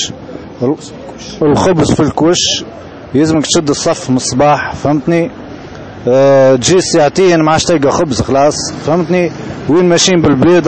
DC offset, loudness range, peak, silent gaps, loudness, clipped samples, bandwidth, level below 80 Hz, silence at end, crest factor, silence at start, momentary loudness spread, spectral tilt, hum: 0.3%; 3 LU; 0 dBFS; none; -11 LUFS; under 0.1%; 8.8 kHz; -38 dBFS; 0 s; 10 dB; 0 s; 18 LU; -4.5 dB/octave; none